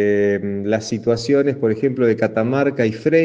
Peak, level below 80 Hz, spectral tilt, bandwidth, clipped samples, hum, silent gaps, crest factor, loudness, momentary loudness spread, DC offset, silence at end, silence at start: -4 dBFS; -58 dBFS; -6.5 dB/octave; 9 kHz; under 0.1%; none; none; 14 dB; -18 LUFS; 4 LU; under 0.1%; 0 s; 0 s